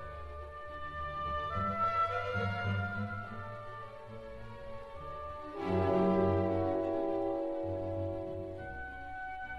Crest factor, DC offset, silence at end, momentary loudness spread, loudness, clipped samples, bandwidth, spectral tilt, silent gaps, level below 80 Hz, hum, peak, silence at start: 18 dB; 0.1%; 0 s; 16 LU; -35 LUFS; under 0.1%; 7 kHz; -8.5 dB/octave; none; -54 dBFS; none; -18 dBFS; 0 s